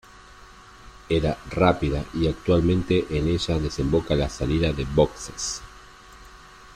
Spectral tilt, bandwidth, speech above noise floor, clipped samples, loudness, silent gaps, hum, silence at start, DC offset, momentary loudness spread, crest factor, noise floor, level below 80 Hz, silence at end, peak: -6 dB/octave; 13.5 kHz; 24 dB; under 0.1%; -24 LUFS; none; none; 0.3 s; under 0.1%; 7 LU; 20 dB; -47 dBFS; -38 dBFS; 0 s; -6 dBFS